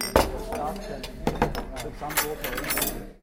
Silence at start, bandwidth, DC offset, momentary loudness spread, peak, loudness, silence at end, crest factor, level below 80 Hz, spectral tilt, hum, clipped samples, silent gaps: 0 s; 17 kHz; under 0.1%; 10 LU; -2 dBFS; -28 LUFS; 0.05 s; 26 dB; -38 dBFS; -3.5 dB/octave; none; under 0.1%; none